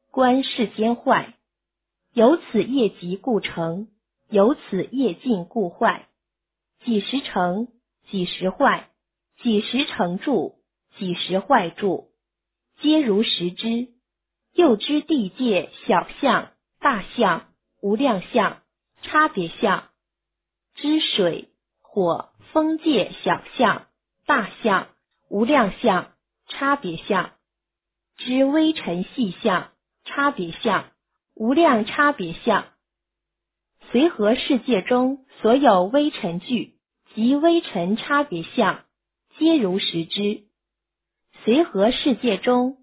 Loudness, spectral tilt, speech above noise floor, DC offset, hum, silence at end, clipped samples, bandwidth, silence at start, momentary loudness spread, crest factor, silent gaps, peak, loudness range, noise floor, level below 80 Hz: -21 LUFS; -9.5 dB/octave; 64 dB; under 0.1%; none; 0.1 s; under 0.1%; 4 kHz; 0.15 s; 10 LU; 20 dB; none; -2 dBFS; 3 LU; -85 dBFS; -60 dBFS